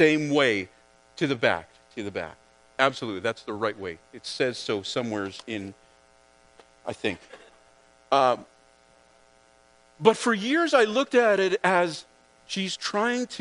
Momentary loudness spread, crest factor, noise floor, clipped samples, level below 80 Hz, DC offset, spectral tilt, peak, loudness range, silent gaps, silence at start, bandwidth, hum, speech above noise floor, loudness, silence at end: 17 LU; 24 dB; -59 dBFS; under 0.1%; -68 dBFS; under 0.1%; -4.5 dB/octave; -4 dBFS; 9 LU; none; 0 s; 10.5 kHz; none; 34 dB; -25 LUFS; 0 s